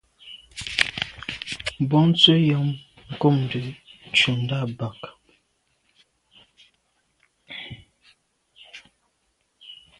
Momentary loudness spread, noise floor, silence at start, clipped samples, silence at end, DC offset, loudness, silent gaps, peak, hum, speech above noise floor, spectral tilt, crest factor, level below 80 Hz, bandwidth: 28 LU; -71 dBFS; 0.25 s; under 0.1%; 0.25 s; under 0.1%; -21 LUFS; none; 0 dBFS; none; 50 dB; -5.5 dB/octave; 26 dB; -56 dBFS; 11.5 kHz